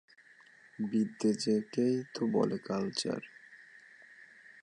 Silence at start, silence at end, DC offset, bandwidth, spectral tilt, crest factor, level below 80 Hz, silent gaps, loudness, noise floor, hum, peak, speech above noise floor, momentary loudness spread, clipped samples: 0.8 s; 0 s; under 0.1%; 11 kHz; -5.5 dB/octave; 18 dB; -78 dBFS; none; -33 LUFS; -60 dBFS; none; -16 dBFS; 28 dB; 23 LU; under 0.1%